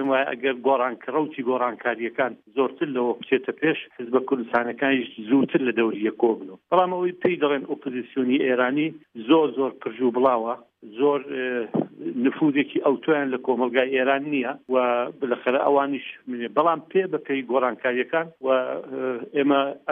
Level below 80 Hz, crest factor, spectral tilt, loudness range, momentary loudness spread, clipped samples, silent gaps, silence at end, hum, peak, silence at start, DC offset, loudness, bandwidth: -76 dBFS; 18 dB; -8.5 dB/octave; 2 LU; 7 LU; under 0.1%; none; 0 s; none; -6 dBFS; 0 s; under 0.1%; -24 LUFS; 3.9 kHz